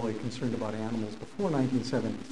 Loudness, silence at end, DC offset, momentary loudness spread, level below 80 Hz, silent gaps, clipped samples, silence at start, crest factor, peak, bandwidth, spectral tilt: -32 LUFS; 0 s; 0.6%; 6 LU; -60 dBFS; none; under 0.1%; 0 s; 18 dB; -14 dBFS; 11 kHz; -6.5 dB/octave